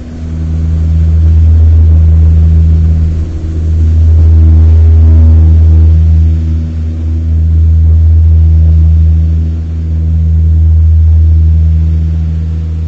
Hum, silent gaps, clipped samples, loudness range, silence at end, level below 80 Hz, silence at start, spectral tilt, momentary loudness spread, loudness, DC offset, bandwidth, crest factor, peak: none; none; under 0.1%; 2 LU; 0 s; -8 dBFS; 0 s; -10.5 dB/octave; 9 LU; -8 LUFS; under 0.1%; 1.8 kHz; 6 dB; 0 dBFS